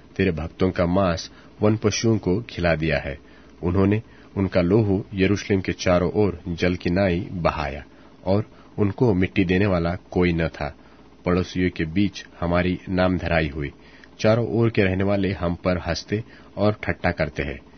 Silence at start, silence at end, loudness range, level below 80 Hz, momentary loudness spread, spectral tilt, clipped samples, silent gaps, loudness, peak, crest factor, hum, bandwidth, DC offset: 0.2 s; 0.2 s; 2 LU; -42 dBFS; 10 LU; -6.5 dB/octave; under 0.1%; none; -23 LUFS; -4 dBFS; 20 dB; none; 6.6 kHz; 0.2%